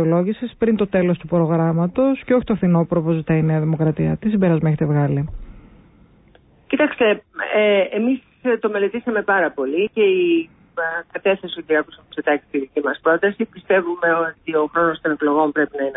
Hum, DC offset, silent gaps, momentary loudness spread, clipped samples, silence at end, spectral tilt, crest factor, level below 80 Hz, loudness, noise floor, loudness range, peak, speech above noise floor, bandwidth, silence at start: none; under 0.1%; none; 6 LU; under 0.1%; 0 s; -12 dB/octave; 14 dB; -48 dBFS; -19 LUFS; -52 dBFS; 3 LU; -6 dBFS; 34 dB; 4 kHz; 0 s